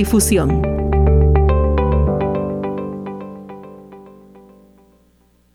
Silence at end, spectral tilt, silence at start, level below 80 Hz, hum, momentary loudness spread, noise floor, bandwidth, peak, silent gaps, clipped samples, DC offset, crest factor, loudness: 1.45 s; -6.5 dB/octave; 0 s; -22 dBFS; 60 Hz at -55 dBFS; 21 LU; -55 dBFS; 15.5 kHz; -4 dBFS; none; under 0.1%; under 0.1%; 14 dB; -17 LUFS